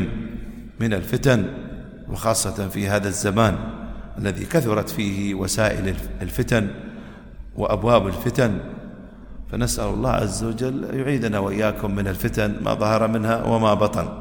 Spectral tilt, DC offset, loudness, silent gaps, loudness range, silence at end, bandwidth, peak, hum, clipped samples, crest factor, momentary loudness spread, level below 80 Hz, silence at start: -5.5 dB/octave; under 0.1%; -22 LUFS; none; 2 LU; 0 s; over 20 kHz; -2 dBFS; none; under 0.1%; 20 dB; 17 LU; -36 dBFS; 0 s